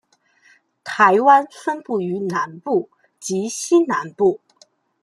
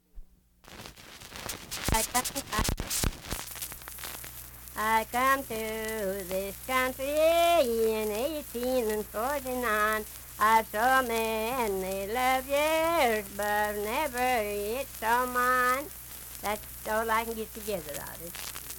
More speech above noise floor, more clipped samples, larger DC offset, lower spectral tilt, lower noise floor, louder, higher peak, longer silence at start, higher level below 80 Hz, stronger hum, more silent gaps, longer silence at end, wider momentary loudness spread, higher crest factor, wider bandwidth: first, 39 dB vs 26 dB; neither; neither; first, -4.5 dB/octave vs -3 dB/octave; about the same, -57 dBFS vs -55 dBFS; first, -19 LUFS vs -29 LUFS; first, 0 dBFS vs -6 dBFS; first, 0.85 s vs 0.15 s; second, -70 dBFS vs -46 dBFS; neither; neither; first, 0.65 s vs 0 s; first, 17 LU vs 13 LU; about the same, 20 dB vs 22 dB; second, 12.5 kHz vs 19 kHz